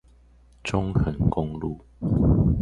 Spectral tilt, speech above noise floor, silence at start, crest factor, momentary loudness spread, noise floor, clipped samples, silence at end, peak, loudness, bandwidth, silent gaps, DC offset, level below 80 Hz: -8.5 dB/octave; 31 dB; 0.65 s; 16 dB; 13 LU; -54 dBFS; under 0.1%; 0 s; -8 dBFS; -25 LUFS; 10.5 kHz; none; under 0.1%; -32 dBFS